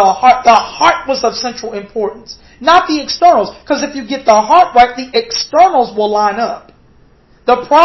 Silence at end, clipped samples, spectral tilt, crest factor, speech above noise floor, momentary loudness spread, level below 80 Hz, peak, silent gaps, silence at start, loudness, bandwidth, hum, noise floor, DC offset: 0 s; 0.4%; -3 dB/octave; 12 dB; 35 dB; 12 LU; -46 dBFS; 0 dBFS; none; 0 s; -12 LUFS; 8 kHz; none; -46 dBFS; under 0.1%